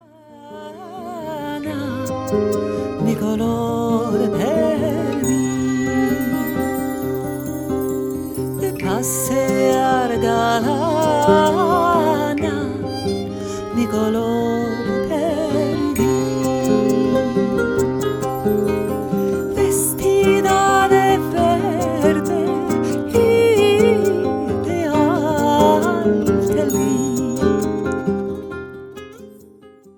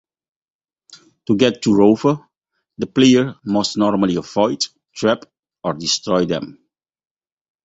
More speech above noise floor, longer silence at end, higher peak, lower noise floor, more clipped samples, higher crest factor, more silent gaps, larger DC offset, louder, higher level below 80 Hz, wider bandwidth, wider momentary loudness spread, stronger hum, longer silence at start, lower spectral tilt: second, 28 dB vs 56 dB; second, 0.3 s vs 1.1 s; about the same, -2 dBFS vs -2 dBFS; second, -45 dBFS vs -73 dBFS; neither; about the same, 16 dB vs 18 dB; second, none vs 5.39-5.43 s; neither; about the same, -18 LUFS vs -18 LUFS; first, -44 dBFS vs -54 dBFS; first, 19 kHz vs 8 kHz; second, 10 LU vs 13 LU; neither; second, 0.3 s vs 1.3 s; about the same, -5.5 dB/octave vs -5 dB/octave